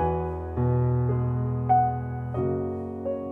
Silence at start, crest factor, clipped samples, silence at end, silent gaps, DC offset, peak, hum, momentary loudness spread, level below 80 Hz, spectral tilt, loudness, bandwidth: 0 s; 16 dB; under 0.1%; 0 s; none; under 0.1%; -10 dBFS; none; 9 LU; -42 dBFS; -12 dB/octave; -27 LUFS; 3.2 kHz